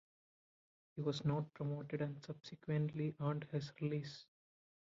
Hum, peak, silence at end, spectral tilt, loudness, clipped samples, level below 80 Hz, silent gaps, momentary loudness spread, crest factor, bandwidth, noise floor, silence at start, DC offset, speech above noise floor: none; -26 dBFS; 0.65 s; -7 dB/octave; -42 LUFS; under 0.1%; -78 dBFS; none; 12 LU; 18 dB; 7.4 kHz; under -90 dBFS; 0.95 s; under 0.1%; over 49 dB